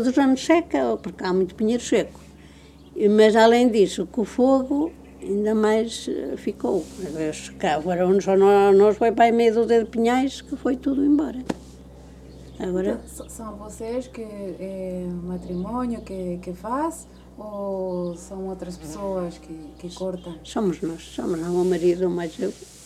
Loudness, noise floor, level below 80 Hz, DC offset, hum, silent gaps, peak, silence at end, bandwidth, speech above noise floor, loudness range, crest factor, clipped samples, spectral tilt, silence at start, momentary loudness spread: -22 LUFS; -47 dBFS; -48 dBFS; under 0.1%; none; none; -2 dBFS; 0 s; 14 kHz; 25 dB; 12 LU; 20 dB; under 0.1%; -6 dB/octave; 0 s; 17 LU